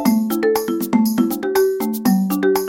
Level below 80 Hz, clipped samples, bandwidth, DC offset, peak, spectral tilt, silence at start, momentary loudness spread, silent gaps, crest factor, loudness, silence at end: -58 dBFS; under 0.1%; 17 kHz; under 0.1%; -4 dBFS; -5.5 dB/octave; 0 s; 2 LU; none; 14 dB; -18 LUFS; 0 s